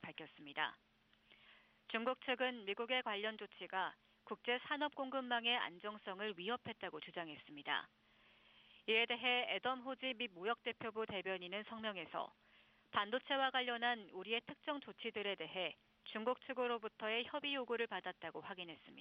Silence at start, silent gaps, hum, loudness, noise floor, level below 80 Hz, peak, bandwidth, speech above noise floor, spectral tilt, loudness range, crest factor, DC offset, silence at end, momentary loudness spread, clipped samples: 0 s; none; none; -42 LUFS; -71 dBFS; -86 dBFS; -22 dBFS; 5.8 kHz; 29 dB; 0 dB/octave; 3 LU; 22 dB; under 0.1%; 0 s; 12 LU; under 0.1%